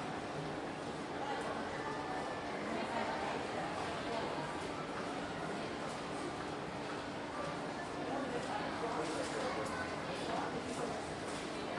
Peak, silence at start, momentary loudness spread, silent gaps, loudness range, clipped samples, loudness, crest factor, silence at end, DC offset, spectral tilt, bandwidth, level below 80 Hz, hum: -26 dBFS; 0 s; 4 LU; none; 2 LU; under 0.1%; -40 LUFS; 14 dB; 0 s; under 0.1%; -4.5 dB/octave; 11.5 kHz; -66 dBFS; none